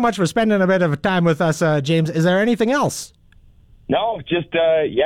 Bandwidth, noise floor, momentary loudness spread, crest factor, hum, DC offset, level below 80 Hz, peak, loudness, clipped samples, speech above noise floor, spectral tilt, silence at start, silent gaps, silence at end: 15 kHz; -49 dBFS; 6 LU; 10 dB; none; under 0.1%; -50 dBFS; -8 dBFS; -18 LUFS; under 0.1%; 32 dB; -6 dB/octave; 0 s; none; 0 s